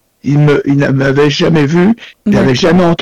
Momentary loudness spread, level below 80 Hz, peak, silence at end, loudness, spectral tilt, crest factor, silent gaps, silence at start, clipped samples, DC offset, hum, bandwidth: 4 LU; -36 dBFS; -4 dBFS; 0 s; -10 LUFS; -7 dB/octave; 6 dB; none; 0.25 s; under 0.1%; under 0.1%; none; 9.6 kHz